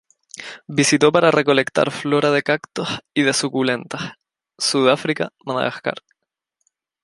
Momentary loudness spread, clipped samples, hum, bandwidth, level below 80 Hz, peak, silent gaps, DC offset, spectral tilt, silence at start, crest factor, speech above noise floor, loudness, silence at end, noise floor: 16 LU; under 0.1%; none; 11.5 kHz; -64 dBFS; 0 dBFS; none; under 0.1%; -4 dB/octave; 0.35 s; 20 dB; 57 dB; -19 LUFS; 1.05 s; -76 dBFS